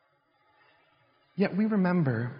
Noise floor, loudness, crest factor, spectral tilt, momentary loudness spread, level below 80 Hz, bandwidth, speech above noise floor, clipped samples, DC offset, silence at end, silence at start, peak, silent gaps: -69 dBFS; -27 LUFS; 16 dB; -8 dB/octave; 6 LU; -74 dBFS; 5.4 kHz; 43 dB; under 0.1%; under 0.1%; 0 s; 1.35 s; -14 dBFS; none